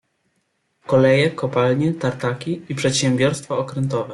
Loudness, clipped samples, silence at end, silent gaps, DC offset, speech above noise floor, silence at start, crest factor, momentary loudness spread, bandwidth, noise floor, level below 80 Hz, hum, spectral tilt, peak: -20 LUFS; under 0.1%; 0 s; none; under 0.1%; 50 dB; 0.9 s; 16 dB; 9 LU; 12 kHz; -69 dBFS; -58 dBFS; none; -5.5 dB/octave; -4 dBFS